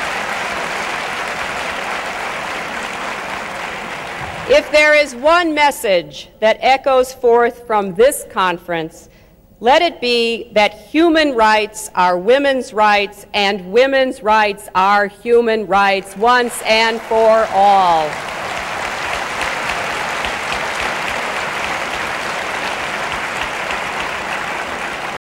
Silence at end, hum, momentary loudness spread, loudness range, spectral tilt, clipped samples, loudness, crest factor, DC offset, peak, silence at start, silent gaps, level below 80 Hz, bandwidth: 0.1 s; none; 10 LU; 7 LU; -3 dB/octave; under 0.1%; -16 LUFS; 16 dB; under 0.1%; 0 dBFS; 0 s; none; -46 dBFS; 16 kHz